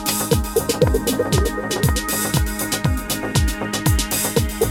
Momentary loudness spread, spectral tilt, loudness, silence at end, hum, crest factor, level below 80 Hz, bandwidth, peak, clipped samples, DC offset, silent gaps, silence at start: 3 LU; -4 dB/octave; -20 LUFS; 0 s; none; 18 dB; -26 dBFS; 19 kHz; -2 dBFS; under 0.1%; under 0.1%; none; 0 s